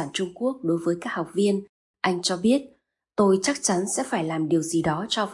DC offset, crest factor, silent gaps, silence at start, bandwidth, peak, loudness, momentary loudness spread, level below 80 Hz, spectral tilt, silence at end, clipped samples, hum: under 0.1%; 16 dB; 1.69-1.94 s; 0 s; 11.5 kHz; -8 dBFS; -25 LUFS; 7 LU; -62 dBFS; -4.5 dB/octave; 0 s; under 0.1%; none